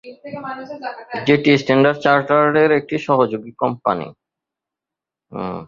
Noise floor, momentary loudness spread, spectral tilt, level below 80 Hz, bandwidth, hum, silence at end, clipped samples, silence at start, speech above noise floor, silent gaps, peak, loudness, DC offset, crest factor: -87 dBFS; 16 LU; -7 dB/octave; -58 dBFS; 7.4 kHz; none; 0 s; under 0.1%; 0.05 s; 69 dB; none; -2 dBFS; -17 LUFS; under 0.1%; 18 dB